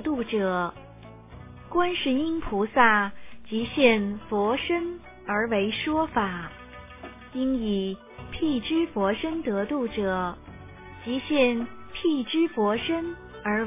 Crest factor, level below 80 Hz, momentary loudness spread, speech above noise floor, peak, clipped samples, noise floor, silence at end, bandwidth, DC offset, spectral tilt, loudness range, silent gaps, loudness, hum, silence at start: 22 dB; -50 dBFS; 22 LU; 21 dB; -6 dBFS; under 0.1%; -46 dBFS; 0 s; 3.9 kHz; under 0.1%; -3.5 dB/octave; 4 LU; none; -26 LUFS; none; 0 s